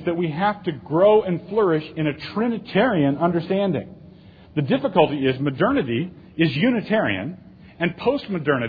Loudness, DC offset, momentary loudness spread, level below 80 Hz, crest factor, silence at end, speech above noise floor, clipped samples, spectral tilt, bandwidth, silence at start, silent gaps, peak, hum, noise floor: -21 LUFS; under 0.1%; 9 LU; -56 dBFS; 20 dB; 0 s; 25 dB; under 0.1%; -9.5 dB/octave; 5 kHz; 0 s; none; -2 dBFS; none; -46 dBFS